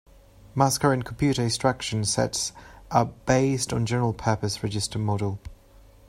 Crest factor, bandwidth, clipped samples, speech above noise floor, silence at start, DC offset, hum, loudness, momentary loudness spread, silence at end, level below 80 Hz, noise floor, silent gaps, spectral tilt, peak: 22 dB; 16 kHz; under 0.1%; 28 dB; 0.45 s; under 0.1%; none; -25 LUFS; 7 LU; 0.55 s; -48 dBFS; -52 dBFS; none; -5 dB/octave; -4 dBFS